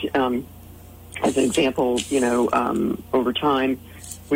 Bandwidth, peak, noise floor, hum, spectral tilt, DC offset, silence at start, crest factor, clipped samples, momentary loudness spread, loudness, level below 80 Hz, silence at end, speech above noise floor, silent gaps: 16.5 kHz; -6 dBFS; -42 dBFS; none; -4.5 dB/octave; under 0.1%; 0 s; 16 dB; under 0.1%; 13 LU; -22 LUFS; -50 dBFS; 0 s; 21 dB; none